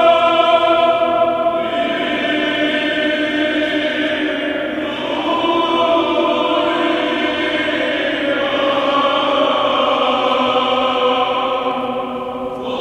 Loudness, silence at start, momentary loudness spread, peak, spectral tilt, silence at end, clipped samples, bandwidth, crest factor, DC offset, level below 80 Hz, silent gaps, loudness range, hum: -16 LUFS; 0 s; 7 LU; -2 dBFS; -4.5 dB/octave; 0 s; under 0.1%; 10 kHz; 14 dB; under 0.1%; -52 dBFS; none; 2 LU; none